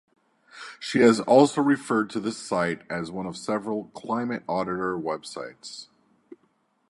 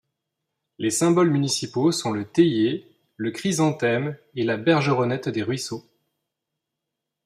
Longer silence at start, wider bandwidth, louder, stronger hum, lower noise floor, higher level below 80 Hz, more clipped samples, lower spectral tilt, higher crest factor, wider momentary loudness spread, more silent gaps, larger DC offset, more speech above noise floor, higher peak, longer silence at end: second, 0.55 s vs 0.8 s; second, 11.5 kHz vs 14.5 kHz; about the same, -25 LUFS vs -23 LUFS; neither; second, -68 dBFS vs -83 dBFS; about the same, -66 dBFS vs -66 dBFS; neither; about the same, -5.5 dB/octave vs -5 dB/octave; about the same, 22 dB vs 18 dB; first, 19 LU vs 11 LU; neither; neither; second, 44 dB vs 61 dB; about the same, -4 dBFS vs -6 dBFS; second, 0.55 s vs 1.45 s